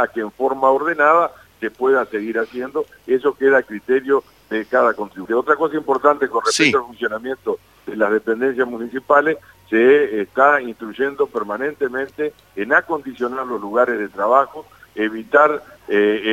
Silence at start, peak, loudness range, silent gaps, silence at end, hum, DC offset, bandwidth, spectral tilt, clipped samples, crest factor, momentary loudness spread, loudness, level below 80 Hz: 0 s; 0 dBFS; 3 LU; none; 0 s; none; under 0.1%; 13.5 kHz; -4 dB/octave; under 0.1%; 18 dB; 12 LU; -18 LUFS; -60 dBFS